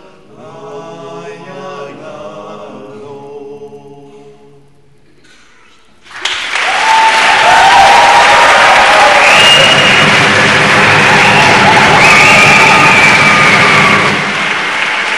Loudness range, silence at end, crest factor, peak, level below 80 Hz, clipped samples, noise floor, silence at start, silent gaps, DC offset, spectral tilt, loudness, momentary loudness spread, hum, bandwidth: 9 LU; 0 s; 8 dB; 0 dBFS; -40 dBFS; 2%; -47 dBFS; 0.45 s; none; 0.7%; -2.5 dB/octave; -5 LUFS; 24 LU; none; over 20 kHz